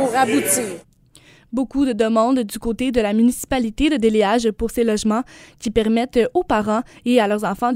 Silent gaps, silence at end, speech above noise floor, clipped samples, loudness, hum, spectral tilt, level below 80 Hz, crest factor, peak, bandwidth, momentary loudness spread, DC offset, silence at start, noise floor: none; 0 s; 32 dB; under 0.1%; -19 LUFS; none; -4.5 dB/octave; -40 dBFS; 16 dB; -2 dBFS; 16 kHz; 8 LU; under 0.1%; 0 s; -50 dBFS